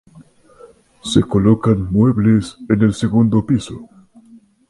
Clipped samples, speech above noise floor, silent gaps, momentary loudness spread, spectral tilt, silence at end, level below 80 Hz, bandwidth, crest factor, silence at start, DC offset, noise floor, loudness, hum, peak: under 0.1%; 32 dB; none; 6 LU; -7.5 dB/octave; 0.85 s; -40 dBFS; 11.5 kHz; 16 dB; 0.15 s; under 0.1%; -47 dBFS; -15 LUFS; none; 0 dBFS